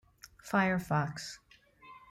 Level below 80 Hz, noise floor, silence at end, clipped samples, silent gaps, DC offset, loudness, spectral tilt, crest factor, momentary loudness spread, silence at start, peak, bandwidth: -64 dBFS; -57 dBFS; 0.1 s; under 0.1%; none; under 0.1%; -32 LUFS; -6 dB/octave; 18 dB; 22 LU; 0.25 s; -16 dBFS; 15.5 kHz